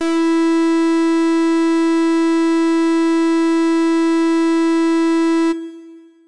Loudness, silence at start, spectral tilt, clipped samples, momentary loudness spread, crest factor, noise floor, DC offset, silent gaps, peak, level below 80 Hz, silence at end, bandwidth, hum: -15 LUFS; 0 s; -3 dB/octave; under 0.1%; 1 LU; 4 dB; -40 dBFS; 1%; none; -12 dBFS; -72 dBFS; 0 s; 11 kHz; none